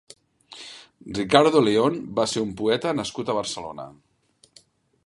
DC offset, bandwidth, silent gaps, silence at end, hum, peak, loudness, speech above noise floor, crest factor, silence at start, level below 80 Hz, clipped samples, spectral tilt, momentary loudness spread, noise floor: under 0.1%; 11.5 kHz; none; 1.15 s; none; 0 dBFS; -22 LUFS; 35 dB; 24 dB; 0.5 s; -58 dBFS; under 0.1%; -4.5 dB/octave; 23 LU; -57 dBFS